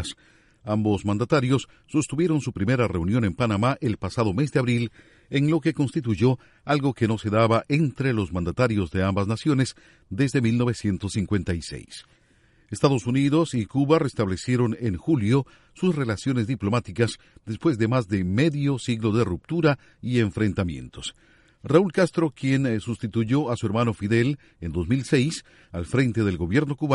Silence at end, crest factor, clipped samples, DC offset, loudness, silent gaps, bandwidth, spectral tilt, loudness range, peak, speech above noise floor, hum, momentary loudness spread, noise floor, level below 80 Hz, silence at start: 0 s; 20 dB; under 0.1%; under 0.1%; -24 LUFS; none; 11.5 kHz; -7 dB/octave; 2 LU; -4 dBFS; 36 dB; none; 9 LU; -60 dBFS; -48 dBFS; 0 s